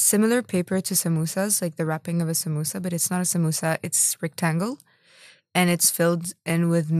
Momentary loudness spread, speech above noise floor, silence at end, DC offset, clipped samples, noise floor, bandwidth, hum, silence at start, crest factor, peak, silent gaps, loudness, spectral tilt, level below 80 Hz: 8 LU; 30 dB; 0 s; under 0.1%; under 0.1%; -53 dBFS; 16 kHz; none; 0 s; 18 dB; -4 dBFS; none; -23 LUFS; -4 dB/octave; -70 dBFS